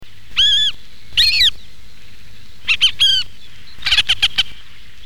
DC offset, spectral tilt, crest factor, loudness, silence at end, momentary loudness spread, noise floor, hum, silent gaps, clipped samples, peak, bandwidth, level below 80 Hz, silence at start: 6%; 1 dB/octave; 16 dB; -14 LUFS; 0 s; 12 LU; -44 dBFS; none; none; under 0.1%; -2 dBFS; 19 kHz; -42 dBFS; 0 s